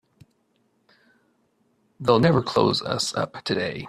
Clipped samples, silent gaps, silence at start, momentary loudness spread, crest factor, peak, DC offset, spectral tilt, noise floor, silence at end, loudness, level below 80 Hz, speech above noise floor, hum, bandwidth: under 0.1%; none; 2 s; 8 LU; 22 dB; -4 dBFS; under 0.1%; -5 dB/octave; -68 dBFS; 0 s; -22 LUFS; -58 dBFS; 46 dB; none; 13.5 kHz